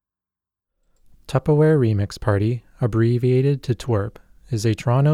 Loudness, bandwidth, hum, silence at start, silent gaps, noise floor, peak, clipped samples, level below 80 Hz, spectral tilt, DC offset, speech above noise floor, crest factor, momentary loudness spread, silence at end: -20 LUFS; 12.5 kHz; none; 1.3 s; none; -90 dBFS; -6 dBFS; under 0.1%; -46 dBFS; -8 dB/octave; under 0.1%; 71 dB; 14 dB; 8 LU; 0 s